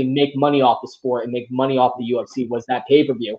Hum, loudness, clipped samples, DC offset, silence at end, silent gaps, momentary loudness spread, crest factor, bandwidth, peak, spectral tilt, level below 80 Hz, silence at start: none; -19 LUFS; under 0.1%; under 0.1%; 0 s; none; 8 LU; 16 dB; 7.4 kHz; -2 dBFS; -7 dB/octave; -68 dBFS; 0 s